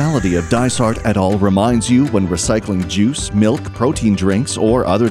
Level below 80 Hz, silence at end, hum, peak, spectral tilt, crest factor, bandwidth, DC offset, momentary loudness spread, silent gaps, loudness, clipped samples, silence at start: -34 dBFS; 0 s; none; -2 dBFS; -5.5 dB/octave; 14 dB; 13.5 kHz; under 0.1%; 3 LU; none; -15 LUFS; under 0.1%; 0 s